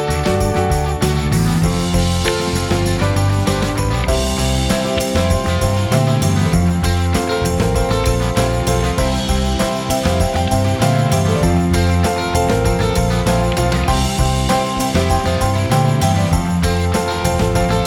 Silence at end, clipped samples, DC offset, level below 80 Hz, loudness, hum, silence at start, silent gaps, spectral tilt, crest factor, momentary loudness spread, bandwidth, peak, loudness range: 0 s; under 0.1%; under 0.1%; -24 dBFS; -16 LUFS; none; 0 s; none; -5.5 dB/octave; 14 dB; 2 LU; 17 kHz; -2 dBFS; 1 LU